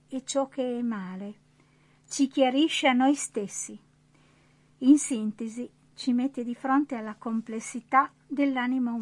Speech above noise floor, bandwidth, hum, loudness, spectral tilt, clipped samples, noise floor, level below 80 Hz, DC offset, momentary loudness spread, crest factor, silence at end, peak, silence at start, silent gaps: 35 dB; 11.5 kHz; none; -27 LUFS; -3.5 dB/octave; under 0.1%; -61 dBFS; -76 dBFS; under 0.1%; 14 LU; 20 dB; 0 s; -8 dBFS; 0.1 s; none